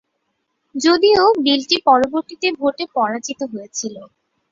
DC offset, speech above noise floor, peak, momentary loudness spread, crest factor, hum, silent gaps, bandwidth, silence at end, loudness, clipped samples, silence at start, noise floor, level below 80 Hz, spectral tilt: under 0.1%; 55 dB; -2 dBFS; 14 LU; 18 dB; none; none; 7.8 kHz; 0.45 s; -17 LUFS; under 0.1%; 0.75 s; -71 dBFS; -60 dBFS; -2.5 dB/octave